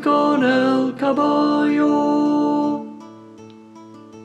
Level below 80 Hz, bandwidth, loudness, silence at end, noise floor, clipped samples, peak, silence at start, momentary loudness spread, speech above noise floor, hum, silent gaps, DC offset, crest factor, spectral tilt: -68 dBFS; 8.4 kHz; -18 LUFS; 0 s; -41 dBFS; under 0.1%; -4 dBFS; 0 s; 8 LU; 25 dB; none; none; under 0.1%; 14 dB; -6 dB/octave